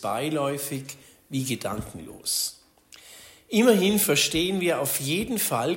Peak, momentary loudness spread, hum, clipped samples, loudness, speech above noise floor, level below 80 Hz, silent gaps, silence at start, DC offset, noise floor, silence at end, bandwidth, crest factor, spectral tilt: -8 dBFS; 15 LU; none; under 0.1%; -25 LUFS; 28 dB; -54 dBFS; none; 0 s; under 0.1%; -53 dBFS; 0 s; 16.5 kHz; 18 dB; -3.5 dB/octave